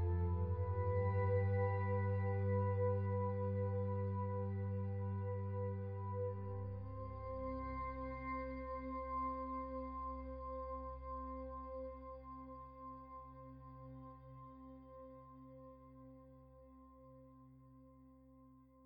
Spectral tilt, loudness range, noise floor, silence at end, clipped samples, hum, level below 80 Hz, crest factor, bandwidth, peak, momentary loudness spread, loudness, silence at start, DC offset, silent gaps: -11.5 dB/octave; 20 LU; -64 dBFS; 0 s; under 0.1%; none; -56 dBFS; 16 dB; 2.9 kHz; -26 dBFS; 22 LU; -42 LUFS; 0 s; under 0.1%; none